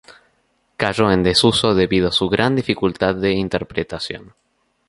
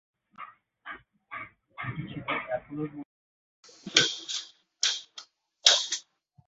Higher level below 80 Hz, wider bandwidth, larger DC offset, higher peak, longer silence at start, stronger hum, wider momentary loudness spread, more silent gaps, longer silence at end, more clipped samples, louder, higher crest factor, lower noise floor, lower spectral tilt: first, -42 dBFS vs -68 dBFS; first, 11.5 kHz vs 8.4 kHz; neither; about the same, 0 dBFS vs -2 dBFS; second, 0.1 s vs 0.4 s; neither; second, 12 LU vs 25 LU; second, none vs 3.05-3.63 s; first, 0.65 s vs 0.45 s; neither; first, -18 LUFS vs -27 LUFS; second, 18 dB vs 30 dB; first, -64 dBFS vs -54 dBFS; first, -5 dB/octave vs -1 dB/octave